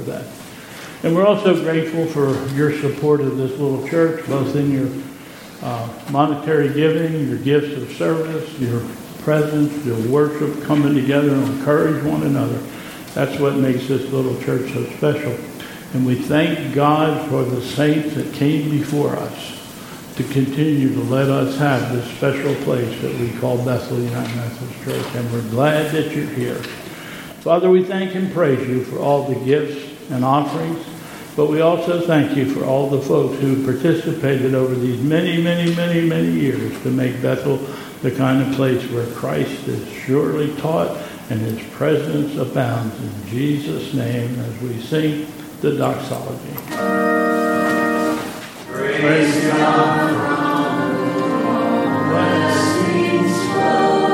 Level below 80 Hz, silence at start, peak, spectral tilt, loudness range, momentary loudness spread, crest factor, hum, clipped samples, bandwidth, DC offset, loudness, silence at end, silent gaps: -56 dBFS; 0 s; 0 dBFS; -6.5 dB/octave; 4 LU; 11 LU; 18 dB; none; under 0.1%; 17 kHz; under 0.1%; -19 LUFS; 0 s; none